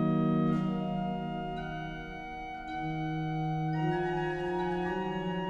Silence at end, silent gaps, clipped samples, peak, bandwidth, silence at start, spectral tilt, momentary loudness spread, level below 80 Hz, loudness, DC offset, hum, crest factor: 0 s; none; under 0.1%; -18 dBFS; 7 kHz; 0 s; -8.5 dB/octave; 11 LU; -52 dBFS; -33 LUFS; under 0.1%; none; 14 dB